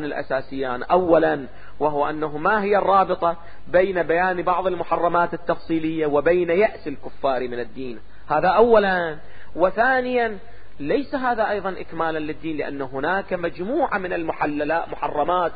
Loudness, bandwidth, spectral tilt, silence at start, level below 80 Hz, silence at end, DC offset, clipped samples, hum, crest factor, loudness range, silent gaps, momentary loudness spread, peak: -22 LUFS; 5 kHz; -10.5 dB/octave; 0 s; -48 dBFS; 0 s; 2%; under 0.1%; none; 18 dB; 4 LU; none; 12 LU; -4 dBFS